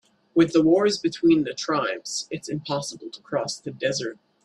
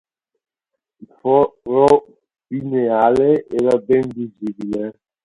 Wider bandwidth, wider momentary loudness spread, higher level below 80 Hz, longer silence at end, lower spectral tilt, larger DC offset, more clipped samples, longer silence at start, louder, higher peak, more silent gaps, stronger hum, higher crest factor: about the same, 11 kHz vs 11.5 kHz; about the same, 12 LU vs 13 LU; second, -64 dBFS vs -54 dBFS; about the same, 0.3 s vs 0.35 s; second, -4.5 dB/octave vs -8 dB/octave; neither; neither; second, 0.35 s vs 1 s; second, -24 LUFS vs -17 LUFS; second, -6 dBFS vs 0 dBFS; neither; neither; about the same, 18 dB vs 18 dB